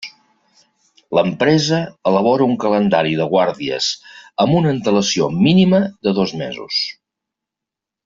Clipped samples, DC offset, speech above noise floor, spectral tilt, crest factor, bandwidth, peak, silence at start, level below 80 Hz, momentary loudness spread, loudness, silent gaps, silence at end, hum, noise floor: under 0.1%; under 0.1%; 69 dB; -5.5 dB/octave; 16 dB; 7.6 kHz; -2 dBFS; 0 s; -56 dBFS; 7 LU; -16 LUFS; none; 1.15 s; none; -85 dBFS